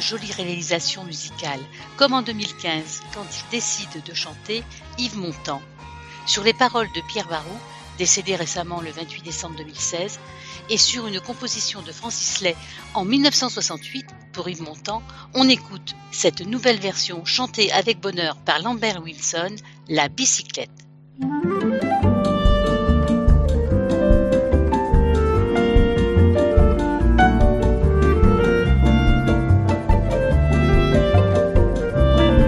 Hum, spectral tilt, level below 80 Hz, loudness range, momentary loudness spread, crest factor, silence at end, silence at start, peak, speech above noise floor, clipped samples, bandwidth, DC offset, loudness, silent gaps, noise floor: none; -4.5 dB/octave; -24 dBFS; 7 LU; 14 LU; 20 dB; 0 s; 0 s; 0 dBFS; 15 dB; under 0.1%; 11.5 kHz; under 0.1%; -20 LUFS; none; -39 dBFS